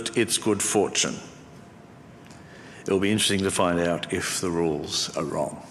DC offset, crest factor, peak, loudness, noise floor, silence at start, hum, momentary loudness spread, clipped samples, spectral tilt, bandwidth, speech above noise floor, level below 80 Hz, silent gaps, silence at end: under 0.1%; 18 dB; -8 dBFS; -24 LUFS; -47 dBFS; 0 s; none; 16 LU; under 0.1%; -3.5 dB/octave; 14.5 kHz; 22 dB; -60 dBFS; none; 0 s